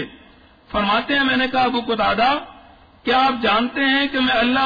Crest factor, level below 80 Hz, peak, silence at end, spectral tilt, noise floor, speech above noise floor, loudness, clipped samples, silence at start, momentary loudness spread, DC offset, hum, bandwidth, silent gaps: 12 dB; -46 dBFS; -6 dBFS; 0 s; -5.5 dB/octave; -49 dBFS; 31 dB; -18 LUFS; under 0.1%; 0 s; 7 LU; under 0.1%; none; 5 kHz; none